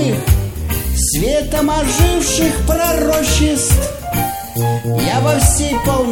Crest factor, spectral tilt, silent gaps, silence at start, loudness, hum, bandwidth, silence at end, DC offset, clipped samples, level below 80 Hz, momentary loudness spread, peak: 14 dB; -4.5 dB/octave; none; 0 s; -15 LUFS; none; 17 kHz; 0 s; 0.3%; under 0.1%; -20 dBFS; 6 LU; 0 dBFS